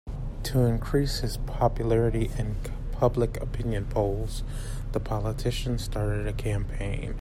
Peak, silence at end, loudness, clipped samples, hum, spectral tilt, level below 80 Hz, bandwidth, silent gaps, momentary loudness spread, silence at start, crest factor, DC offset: -10 dBFS; 0 s; -29 LUFS; under 0.1%; none; -6.5 dB/octave; -32 dBFS; 15.5 kHz; none; 10 LU; 0.05 s; 18 dB; under 0.1%